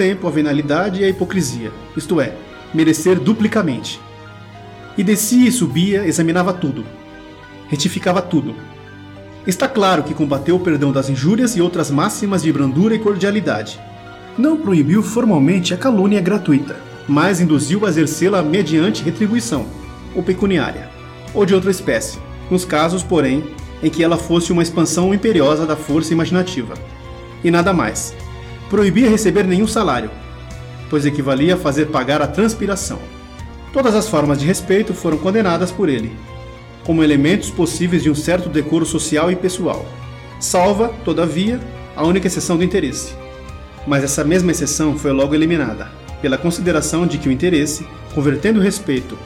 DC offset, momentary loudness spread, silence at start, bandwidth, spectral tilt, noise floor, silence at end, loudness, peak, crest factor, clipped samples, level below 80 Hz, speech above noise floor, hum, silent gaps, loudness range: under 0.1%; 18 LU; 0 s; 17 kHz; -5.5 dB/octave; -37 dBFS; 0 s; -16 LUFS; -2 dBFS; 14 dB; under 0.1%; -38 dBFS; 21 dB; none; none; 3 LU